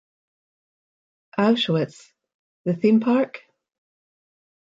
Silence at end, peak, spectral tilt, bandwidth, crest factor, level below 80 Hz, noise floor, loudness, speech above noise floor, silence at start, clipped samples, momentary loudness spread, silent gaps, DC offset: 1.3 s; -8 dBFS; -7 dB/octave; 7.8 kHz; 18 dB; -74 dBFS; under -90 dBFS; -22 LUFS; over 70 dB; 1.35 s; under 0.1%; 13 LU; 2.34-2.64 s; under 0.1%